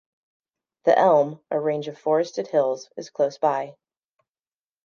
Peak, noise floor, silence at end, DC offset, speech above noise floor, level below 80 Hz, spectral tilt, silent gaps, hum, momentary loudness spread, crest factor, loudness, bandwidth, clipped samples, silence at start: -6 dBFS; under -90 dBFS; 1.15 s; under 0.1%; over 68 dB; -82 dBFS; -6 dB/octave; none; none; 11 LU; 18 dB; -23 LUFS; 7.2 kHz; under 0.1%; 0.85 s